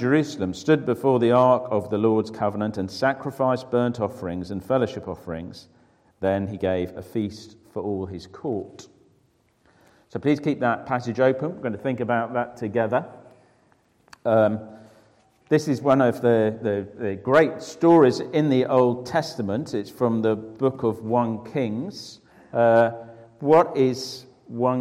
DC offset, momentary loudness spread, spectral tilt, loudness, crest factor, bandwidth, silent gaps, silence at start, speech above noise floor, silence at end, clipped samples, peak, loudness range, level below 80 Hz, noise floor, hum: under 0.1%; 14 LU; -7 dB/octave; -23 LUFS; 18 dB; 15.5 kHz; none; 0 s; 41 dB; 0 s; under 0.1%; -6 dBFS; 8 LU; -62 dBFS; -64 dBFS; none